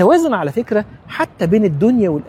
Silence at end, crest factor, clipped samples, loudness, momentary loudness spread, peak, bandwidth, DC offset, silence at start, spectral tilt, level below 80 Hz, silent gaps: 0 s; 14 dB; under 0.1%; -16 LUFS; 9 LU; 0 dBFS; 15 kHz; under 0.1%; 0 s; -7.5 dB/octave; -48 dBFS; none